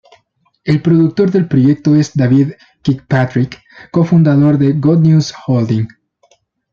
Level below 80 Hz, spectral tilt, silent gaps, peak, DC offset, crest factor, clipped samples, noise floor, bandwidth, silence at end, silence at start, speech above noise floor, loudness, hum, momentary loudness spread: -50 dBFS; -8 dB/octave; none; -2 dBFS; under 0.1%; 12 dB; under 0.1%; -59 dBFS; 7.2 kHz; 0.85 s; 0.65 s; 48 dB; -12 LUFS; none; 9 LU